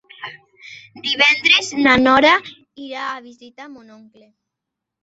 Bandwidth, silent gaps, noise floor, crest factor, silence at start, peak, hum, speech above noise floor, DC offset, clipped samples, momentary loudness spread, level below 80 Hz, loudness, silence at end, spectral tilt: 8 kHz; none; -82 dBFS; 18 dB; 0.2 s; 0 dBFS; none; 64 dB; under 0.1%; under 0.1%; 22 LU; -52 dBFS; -14 LUFS; 1.25 s; -2.5 dB/octave